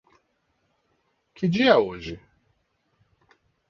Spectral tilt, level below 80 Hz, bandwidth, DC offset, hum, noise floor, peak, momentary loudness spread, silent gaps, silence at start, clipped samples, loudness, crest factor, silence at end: -6.5 dB/octave; -58 dBFS; 7.2 kHz; under 0.1%; none; -71 dBFS; -4 dBFS; 20 LU; none; 1.4 s; under 0.1%; -21 LUFS; 24 dB; 1.5 s